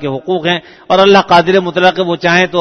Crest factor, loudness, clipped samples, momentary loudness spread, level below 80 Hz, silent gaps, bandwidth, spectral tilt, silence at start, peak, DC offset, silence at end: 10 dB; -10 LUFS; 0.2%; 8 LU; -50 dBFS; none; 7 kHz; -5 dB/octave; 0 s; 0 dBFS; under 0.1%; 0 s